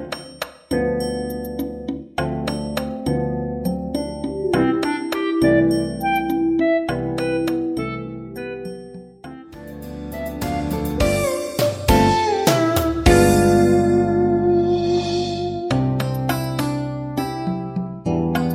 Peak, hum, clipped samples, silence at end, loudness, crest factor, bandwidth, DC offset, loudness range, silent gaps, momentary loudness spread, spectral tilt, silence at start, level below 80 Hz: -2 dBFS; none; under 0.1%; 0 s; -20 LUFS; 18 dB; 16 kHz; under 0.1%; 9 LU; none; 16 LU; -6 dB/octave; 0 s; -34 dBFS